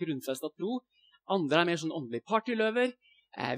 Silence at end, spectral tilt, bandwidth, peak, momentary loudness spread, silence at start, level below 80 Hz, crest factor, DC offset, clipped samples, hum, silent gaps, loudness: 0 s; -5 dB/octave; 16 kHz; -10 dBFS; 11 LU; 0 s; -88 dBFS; 22 dB; under 0.1%; under 0.1%; none; none; -31 LUFS